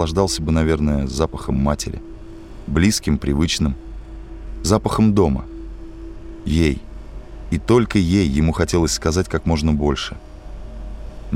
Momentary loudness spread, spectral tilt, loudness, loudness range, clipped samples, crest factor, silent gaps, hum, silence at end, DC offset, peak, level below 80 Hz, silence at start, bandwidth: 21 LU; -5.5 dB/octave; -19 LUFS; 3 LU; under 0.1%; 16 dB; none; none; 0 s; under 0.1%; -2 dBFS; -28 dBFS; 0 s; 16 kHz